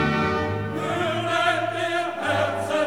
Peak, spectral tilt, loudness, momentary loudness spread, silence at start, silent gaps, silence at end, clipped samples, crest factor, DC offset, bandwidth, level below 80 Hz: -6 dBFS; -5 dB/octave; -24 LUFS; 5 LU; 0 s; none; 0 s; under 0.1%; 16 dB; 0.3%; 19 kHz; -52 dBFS